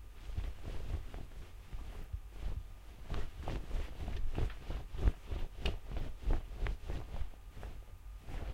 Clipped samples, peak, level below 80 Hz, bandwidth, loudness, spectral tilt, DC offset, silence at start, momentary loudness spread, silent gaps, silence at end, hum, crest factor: under 0.1%; -18 dBFS; -40 dBFS; 14 kHz; -44 LUFS; -6.5 dB/octave; under 0.1%; 0 s; 11 LU; none; 0 s; none; 20 dB